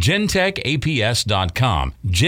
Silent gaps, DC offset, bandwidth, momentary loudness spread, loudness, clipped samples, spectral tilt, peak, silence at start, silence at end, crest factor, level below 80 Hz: none; under 0.1%; 17 kHz; 4 LU; -19 LUFS; under 0.1%; -4.5 dB/octave; -6 dBFS; 0 s; 0 s; 12 dB; -32 dBFS